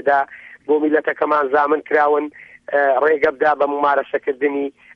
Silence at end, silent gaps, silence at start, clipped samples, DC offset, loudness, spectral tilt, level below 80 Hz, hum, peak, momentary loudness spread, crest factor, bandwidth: 0.25 s; none; 0.05 s; under 0.1%; under 0.1%; -18 LUFS; -6.5 dB/octave; -62 dBFS; none; -4 dBFS; 7 LU; 14 dB; 5.8 kHz